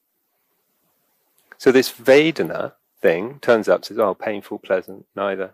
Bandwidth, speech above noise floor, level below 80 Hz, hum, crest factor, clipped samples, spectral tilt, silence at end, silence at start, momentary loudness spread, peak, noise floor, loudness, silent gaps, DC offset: 15.5 kHz; 51 dB; -68 dBFS; none; 18 dB; under 0.1%; -5 dB/octave; 0.05 s; 1.6 s; 13 LU; -4 dBFS; -70 dBFS; -19 LUFS; none; under 0.1%